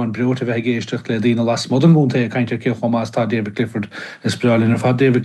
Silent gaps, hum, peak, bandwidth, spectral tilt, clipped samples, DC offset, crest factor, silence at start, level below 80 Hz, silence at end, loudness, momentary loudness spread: none; none; -2 dBFS; 12 kHz; -7 dB/octave; under 0.1%; under 0.1%; 14 dB; 0 s; -62 dBFS; 0 s; -18 LUFS; 9 LU